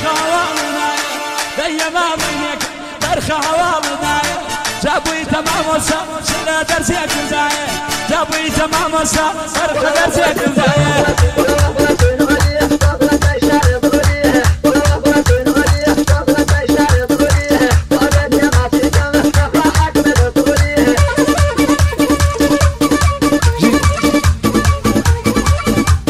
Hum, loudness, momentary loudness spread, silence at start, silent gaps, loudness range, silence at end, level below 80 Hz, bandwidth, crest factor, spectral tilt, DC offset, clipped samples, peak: none; -13 LUFS; 5 LU; 0 s; none; 4 LU; 0 s; -22 dBFS; 15.5 kHz; 12 dB; -5 dB/octave; under 0.1%; under 0.1%; 0 dBFS